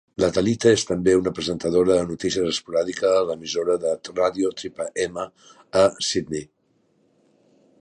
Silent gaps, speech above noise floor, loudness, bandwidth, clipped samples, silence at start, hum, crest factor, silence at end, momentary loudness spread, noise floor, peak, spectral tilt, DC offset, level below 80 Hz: none; 43 dB; -22 LUFS; 11 kHz; under 0.1%; 0.2 s; none; 18 dB; 1.35 s; 9 LU; -65 dBFS; -4 dBFS; -4.5 dB/octave; under 0.1%; -52 dBFS